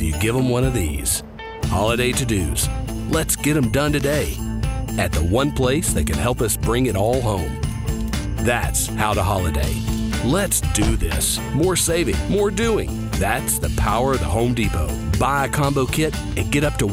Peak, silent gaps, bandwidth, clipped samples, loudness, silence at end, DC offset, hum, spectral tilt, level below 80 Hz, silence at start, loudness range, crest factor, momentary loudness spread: -4 dBFS; none; 16.5 kHz; under 0.1%; -20 LUFS; 0 s; under 0.1%; none; -4.5 dB/octave; -28 dBFS; 0 s; 1 LU; 16 dB; 5 LU